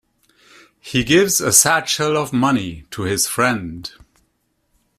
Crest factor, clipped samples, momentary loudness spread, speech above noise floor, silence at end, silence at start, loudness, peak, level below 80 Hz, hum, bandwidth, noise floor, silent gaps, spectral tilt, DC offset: 20 dB; under 0.1%; 17 LU; 50 dB; 1.1 s; 0.85 s; -16 LUFS; 0 dBFS; -48 dBFS; none; 16 kHz; -67 dBFS; none; -3 dB/octave; under 0.1%